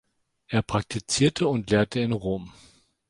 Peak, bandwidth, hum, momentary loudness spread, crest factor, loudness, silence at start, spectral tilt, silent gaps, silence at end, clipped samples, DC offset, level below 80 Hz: -8 dBFS; 11.5 kHz; none; 9 LU; 18 dB; -25 LUFS; 0.5 s; -5 dB/octave; none; 0.6 s; under 0.1%; under 0.1%; -50 dBFS